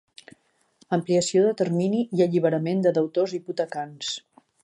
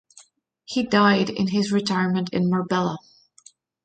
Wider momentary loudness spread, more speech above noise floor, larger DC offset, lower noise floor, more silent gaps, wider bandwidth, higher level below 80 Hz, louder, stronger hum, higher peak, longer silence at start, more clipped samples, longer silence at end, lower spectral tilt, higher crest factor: about the same, 9 LU vs 10 LU; first, 39 dB vs 35 dB; neither; first, -62 dBFS vs -56 dBFS; neither; first, 10.5 kHz vs 9 kHz; second, -74 dBFS vs -62 dBFS; about the same, -24 LUFS vs -22 LUFS; neither; about the same, -8 dBFS vs -6 dBFS; first, 0.9 s vs 0.7 s; neither; second, 0.45 s vs 0.85 s; about the same, -5.5 dB/octave vs -6 dB/octave; about the same, 16 dB vs 18 dB